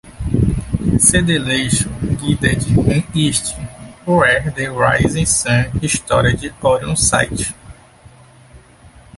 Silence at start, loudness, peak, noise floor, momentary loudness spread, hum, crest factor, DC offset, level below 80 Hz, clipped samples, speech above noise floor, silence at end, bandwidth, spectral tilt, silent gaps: 0.05 s; -15 LUFS; 0 dBFS; -44 dBFS; 9 LU; none; 16 dB; under 0.1%; -30 dBFS; under 0.1%; 28 dB; 0.3 s; 12 kHz; -4 dB/octave; none